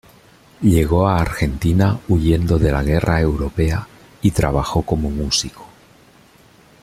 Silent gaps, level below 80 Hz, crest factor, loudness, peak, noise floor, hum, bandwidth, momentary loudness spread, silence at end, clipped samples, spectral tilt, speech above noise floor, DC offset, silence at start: none; -28 dBFS; 16 dB; -18 LUFS; -2 dBFS; -49 dBFS; none; 15 kHz; 5 LU; 1.15 s; under 0.1%; -6 dB/octave; 33 dB; under 0.1%; 0.6 s